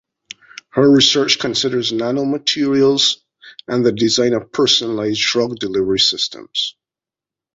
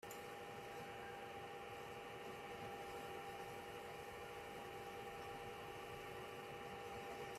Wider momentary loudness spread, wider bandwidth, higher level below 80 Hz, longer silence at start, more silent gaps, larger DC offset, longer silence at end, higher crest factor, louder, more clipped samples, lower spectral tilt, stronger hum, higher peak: first, 10 LU vs 2 LU; second, 8 kHz vs 15.5 kHz; first, -56 dBFS vs -74 dBFS; first, 0.75 s vs 0 s; neither; neither; first, 0.85 s vs 0 s; about the same, 16 dB vs 12 dB; first, -16 LUFS vs -52 LUFS; neither; about the same, -3.5 dB/octave vs -4 dB/octave; neither; first, 0 dBFS vs -38 dBFS